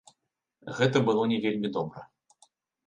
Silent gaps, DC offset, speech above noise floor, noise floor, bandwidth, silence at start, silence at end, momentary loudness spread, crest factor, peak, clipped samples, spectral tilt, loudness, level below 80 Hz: none; under 0.1%; 54 dB; -80 dBFS; 9.6 kHz; 0.65 s; 0.85 s; 19 LU; 20 dB; -10 dBFS; under 0.1%; -6.5 dB/octave; -27 LUFS; -70 dBFS